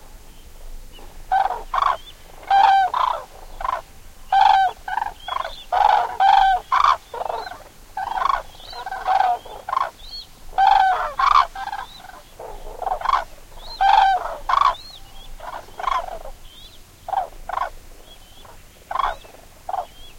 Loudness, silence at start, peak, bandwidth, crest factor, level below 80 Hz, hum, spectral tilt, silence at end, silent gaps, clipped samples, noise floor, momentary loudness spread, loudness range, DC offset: -20 LUFS; 0 s; -4 dBFS; 16.5 kHz; 18 dB; -42 dBFS; none; -2 dB/octave; 0 s; none; under 0.1%; -43 dBFS; 22 LU; 11 LU; under 0.1%